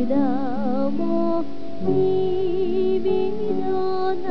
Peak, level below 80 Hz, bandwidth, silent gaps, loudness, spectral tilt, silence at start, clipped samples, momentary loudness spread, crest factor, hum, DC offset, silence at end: -10 dBFS; -60 dBFS; 5.4 kHz; none; -23 LUFS; -9 dB/octave; 0 s; under 0.1%; 4 LU; 12 dB; none; 7%; 0 s